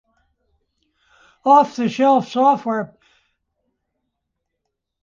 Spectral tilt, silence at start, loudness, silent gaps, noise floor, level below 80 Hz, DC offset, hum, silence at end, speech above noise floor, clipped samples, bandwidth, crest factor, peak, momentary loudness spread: -6 dB/octave; 1.45 s; -17 LUFS; none; -78 dBFS; -68 dBFS; under 0.1%; none; 2.15 s; 62 dB; under 0.1%; 7.4 kHz; 18 dB; -2 dBFS; 11 LU